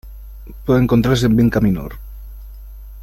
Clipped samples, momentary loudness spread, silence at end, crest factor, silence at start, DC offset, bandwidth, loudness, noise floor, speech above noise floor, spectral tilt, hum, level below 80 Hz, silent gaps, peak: under 0.1%; 24 LU; 0 s; 16 dB; 0.05 s; under 0.1%; 16 kHz; -16 LUFS; -34 dBFS; 19 dB; -7 dB/octave; none; -32 dBFS; none; -2 dBFS